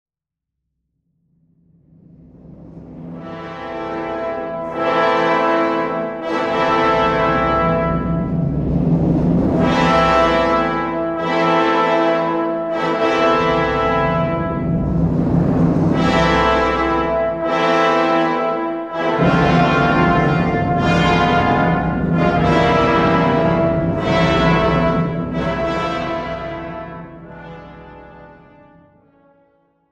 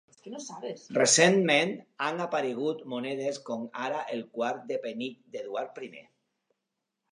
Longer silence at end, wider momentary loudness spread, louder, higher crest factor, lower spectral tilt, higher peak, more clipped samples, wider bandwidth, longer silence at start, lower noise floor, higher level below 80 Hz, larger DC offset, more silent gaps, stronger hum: first, 1.65 s vs 1.1 s; second, 11 LU vs 19 LU; first, -16 LUFS vs -28 LUFS; second, 14 dB vs 24 dB; first, -7 dB/octave vs -3 dB/octave; first, -2 dBFS vs -6 dBFS; neither; second, 8.4 kHz vs 11 kHz; first, 2.45 s vs 0.25 s; about the same, -84 dBFS vs -85 dBFS; first, -34 dBFS vs -82 dBFS; neither; neither; neither